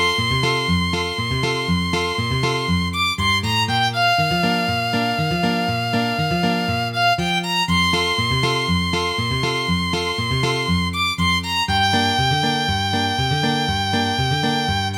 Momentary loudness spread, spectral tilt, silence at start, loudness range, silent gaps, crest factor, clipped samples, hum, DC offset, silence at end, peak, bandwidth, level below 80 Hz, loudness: 3 LU; -4.5 dB/octave; 0 s; 1 LU; none; 14 dB; under 0.1%; none; under 0.1%; 0 s; -6 dBFS; 19.5 kHz; -40 dBFS; -19 LUFS